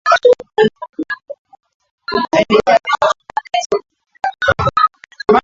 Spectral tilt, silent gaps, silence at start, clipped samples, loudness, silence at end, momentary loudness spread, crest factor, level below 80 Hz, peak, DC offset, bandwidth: -4.5 dB/octave; 1.38-1.45 s, 1.74-1.80 s, 1.91-1.98 s, 3.66-3.70 s; 0.05 s; under 0.1%; -15 LUFS; 0 s; 14 LU; 16 dB; -44 dBFS; 0 dBFS; under 0.1%; 7.8 kHz